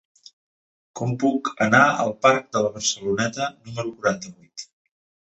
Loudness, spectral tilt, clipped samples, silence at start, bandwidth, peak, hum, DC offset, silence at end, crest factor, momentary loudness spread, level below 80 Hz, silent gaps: -22 LUFS; -4 dB/octave; under 0.1%; 0.95 s; 8.2 kHz; -2 dBFS; none; under 0.1%; 0.6 s; 20 dB; 21 LU; -62 dBFS; none